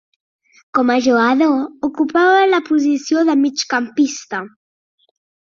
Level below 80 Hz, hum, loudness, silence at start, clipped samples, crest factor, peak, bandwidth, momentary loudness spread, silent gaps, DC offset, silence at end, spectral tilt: -64 dBFS; none; -16 LUFS; 0.75 s; under 0.1%; 14 dB; -2 dBFS; 7.6 kHz; 11 LU; none; under 0.1%; 1.1 s; -3 dB/octave